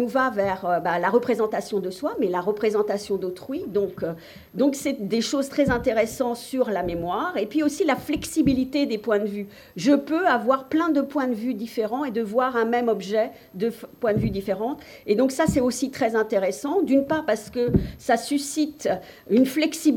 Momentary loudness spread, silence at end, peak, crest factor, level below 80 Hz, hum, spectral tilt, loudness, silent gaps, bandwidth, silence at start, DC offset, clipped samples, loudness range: 7 LU; 0 s; -8 dBFS; 16 dB; -48 dBFS; none; -5.5 dB/octave; -24 LUFS; none; 18 kHz; 0 s; under 0.1%; under 0.1%; 2 LU